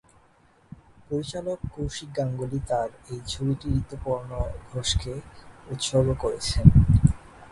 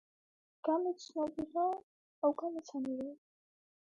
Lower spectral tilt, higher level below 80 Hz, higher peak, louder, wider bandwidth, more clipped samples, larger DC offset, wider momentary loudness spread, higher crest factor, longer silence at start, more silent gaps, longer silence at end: about the same, -6 dB/octave vs -5.5 dB/octave; first, -34 dBFS vs -76 dBFS; first, 0 dBFS vs -20 dBFS; first, -25 LUFS vs -37 LUFS; first, 11.5 kHz vs 8.8 kHz; neither; neither; first, 15 LU vs 7 LU; first, 24 dB vs 18 dB; first, 1.1 s vs 0.65 s; second, none vs 1.83-2.22 s; second, 0.05 s vs 0.7 s